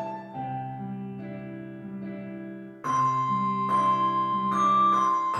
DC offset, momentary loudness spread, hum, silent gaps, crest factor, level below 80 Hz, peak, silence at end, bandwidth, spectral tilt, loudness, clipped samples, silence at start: under 0.1%; 17 LU; none; none; 12 dB; -68 dBFS; -14 dBFS; 0 s; 9.6 kHz; -6 dB/octave; -25 LUFS; under 0.1%; 0 s